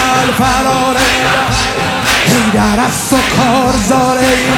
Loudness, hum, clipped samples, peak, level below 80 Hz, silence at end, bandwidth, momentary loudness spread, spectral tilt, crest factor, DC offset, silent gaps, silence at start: -10 LUFS; none; under 0.1%; 0 dBFS; -28 dBFS; 0 s; 17.5 kHz; 3 LU; -3.5 dB/octave; 10 dB; under 0.1%; none; 0 s